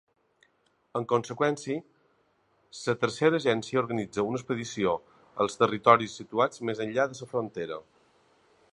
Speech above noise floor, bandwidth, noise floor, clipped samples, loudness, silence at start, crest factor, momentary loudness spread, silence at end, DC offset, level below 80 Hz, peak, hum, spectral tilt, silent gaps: 42 dB; 11 kHz; -70 dBFS; under 0.1%; -28 LUFS; 0.95 s; 26 dB; 12 LU; 0.9 s; under 0.1%; -68 dBFS; -4 dBFS; none; -5 dB/octave; none